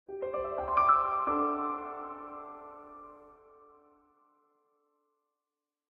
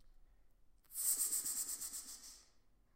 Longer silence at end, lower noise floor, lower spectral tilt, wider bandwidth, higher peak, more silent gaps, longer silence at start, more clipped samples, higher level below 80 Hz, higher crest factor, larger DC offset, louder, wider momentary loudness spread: first, 2.6 s vs 0.4 s; first, under -90 dBFS vs -69 dBFS; first, -8 dB/octave vs 2 dB/octave; second, 5.2 kHz vs 16 kHz; first, -12 dBFS vs -24 dBFS; neither; about the same, 0.1 s vs 0 s; neither; first, -62 dBFS vs -70 dBFS; about the same, 22 dB vs 20 dB; neither; first, -30 LUFS vs -38 LUFS; first, 24 LU vs 17 LU